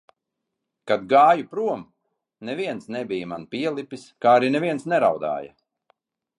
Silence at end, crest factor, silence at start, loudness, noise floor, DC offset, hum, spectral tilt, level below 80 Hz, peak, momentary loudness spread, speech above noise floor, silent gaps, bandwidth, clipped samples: 0.9 s; 20 dB; 0.85 s; -22 LUFS; -82 dBFS; under 0.1%; none; -6 dB/octave; -70 dBFS; -4 dBFS; 16 LU; 60 dB; none; 11 kHz; under 0.1%